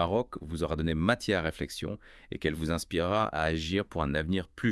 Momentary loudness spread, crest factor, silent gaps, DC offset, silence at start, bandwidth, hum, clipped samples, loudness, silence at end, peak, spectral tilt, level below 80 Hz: 9 LU; 20 dB; none; under 0.1%; 0 s; 12 kHz; none; under 0.1%; -31 LUFS; 0 s; -10 dBFS; -5.5 dB/octave; -48 dBFS